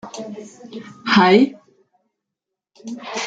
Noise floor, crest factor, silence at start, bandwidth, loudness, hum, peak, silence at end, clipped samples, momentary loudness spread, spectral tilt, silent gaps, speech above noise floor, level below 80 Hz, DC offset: -83 dBFS; 20 dB; 0.05 s; 7.8 kHz; -16 LUFS; none; -2 dBFS; 0 s; under 0.1%; 24 LU; -5 dB/octave; none; 65 dB; -62 dBFS; under 0.1%